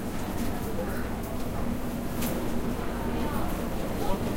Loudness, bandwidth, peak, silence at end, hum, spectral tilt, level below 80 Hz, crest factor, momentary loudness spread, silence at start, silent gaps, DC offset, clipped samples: -32 LUFS; 16 kHz; -12 dBFS; 0 s; none; -6 dB/octave; -36 dBFS; 16 dB; 3 LU; 0 s; none; under 0.1%; under 0.1%